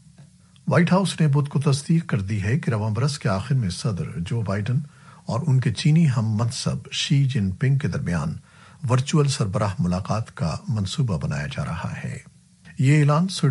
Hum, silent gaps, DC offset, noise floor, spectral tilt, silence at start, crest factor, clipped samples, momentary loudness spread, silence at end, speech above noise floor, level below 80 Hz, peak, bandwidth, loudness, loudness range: none; none; under 0.1%; -50 dBFS; -6 dB/octave; 0.2 s; 16 dB; under 0.1%; 10 LU; 0 s; 28 dB; -50 dBFS; -6 dBFS; 11.5 kHz; -23 LUFS; 3 LU